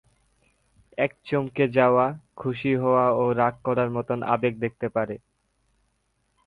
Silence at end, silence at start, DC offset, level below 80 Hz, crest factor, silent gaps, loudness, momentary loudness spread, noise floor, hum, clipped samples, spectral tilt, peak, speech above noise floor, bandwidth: 1.3 s; 1 s; under 0.1%; -60 dBFS; 20 dB; none; -24 LUFS; 10 LU; -71 dBFS; none; under 0.1%; -9 dB/octave; -6 dBFS; 48 dB; 5 kHz